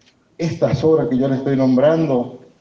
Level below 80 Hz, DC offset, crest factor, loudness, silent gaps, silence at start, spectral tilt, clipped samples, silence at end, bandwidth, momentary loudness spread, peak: -52 dBFS; under 0.1%; 14 dB; -17 LUFS; none; 0.4 s; -8.5 dB/octave; under 0.1%; 0.25 s; 7 kHz; 10 LU; -4 dBFS